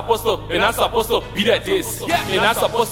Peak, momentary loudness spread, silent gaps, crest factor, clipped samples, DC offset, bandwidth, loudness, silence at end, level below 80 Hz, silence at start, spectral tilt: 0 dBFS; 4 LU; none; 18 dB; under 0.1%; under 0.1%; over 20 kHz; -18 LUFS; 0 s; -38 dBFS; 0 s; -3.5 dB/octave